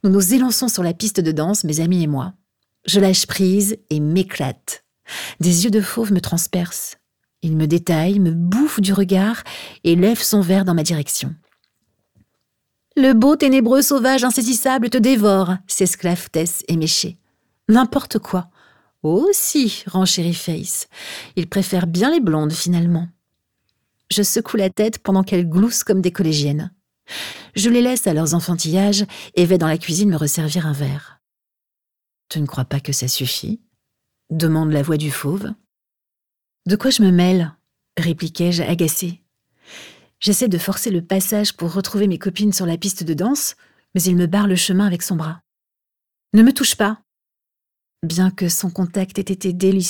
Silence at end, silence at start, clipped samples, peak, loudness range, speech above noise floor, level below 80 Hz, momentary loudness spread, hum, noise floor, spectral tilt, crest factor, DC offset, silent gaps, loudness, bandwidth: 0 s; 0.05 s; under 0.1%; -2 dBFS; 4 LU; 67 dB; -56 dBFS; 12 LU; none; -84 dBFS; -4.5 dB/octave; 16 dB; under 0.1%; none; -18 LUFS; 19.5 kHz